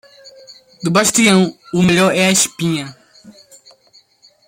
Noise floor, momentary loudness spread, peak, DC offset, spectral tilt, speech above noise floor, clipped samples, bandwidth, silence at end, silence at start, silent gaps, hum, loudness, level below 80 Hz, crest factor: -52 dBFS; 11 LU; 0 dBFS; under 0.1%; -3.5 dB/octave; 38 dB; under 0.1%; 16.5 kHz; 1.15 s; 0.25 s; none; none; -14 LUFS; -54 dBFS; 18 dB